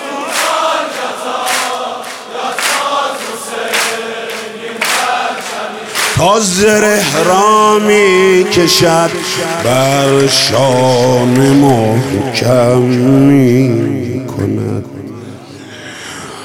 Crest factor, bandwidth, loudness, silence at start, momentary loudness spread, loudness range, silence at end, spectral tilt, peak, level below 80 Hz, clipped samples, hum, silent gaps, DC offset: 12 dB; 18.5 kHz; -11 LUFS; 0 s; 14 LU; 7 LU; 0 s; -4.5 dB/octave; 0 dBFS; -46 dBFS; under 0.1%; none; none; under 0.1%